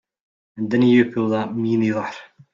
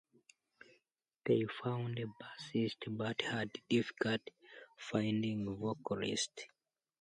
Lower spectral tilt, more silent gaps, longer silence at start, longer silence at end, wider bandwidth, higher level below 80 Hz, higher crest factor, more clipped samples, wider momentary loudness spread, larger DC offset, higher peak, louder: first, -8 dB/octave vs -5 dB/octave; neither; second, 0.55 s vs 1.25 s; second, 0.3 s vs 0.55 s; second, 7.2 kHz vs 10 kHz; first, -64 dBFS vs -74 dBFS; second, 16 dB vs 22 dB; neither; about the same, 15 LU vs 15 LU; neither; first, -4 dBFS vs -16 dBFS; first, -19 LUFS vs -38 LUFS